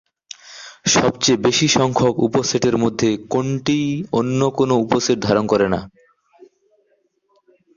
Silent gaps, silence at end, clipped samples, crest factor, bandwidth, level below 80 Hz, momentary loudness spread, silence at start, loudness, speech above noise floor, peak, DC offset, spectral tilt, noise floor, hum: none; 1.9 s; under 0.1%; 18 dB; 7.6 kHz; -50 dBFS; 9 LU; 0.45 s; -18 LUFS; 47 dB; -2 dBFS; under 0.1%; -4.5 dB/octave; -64 dBFS; none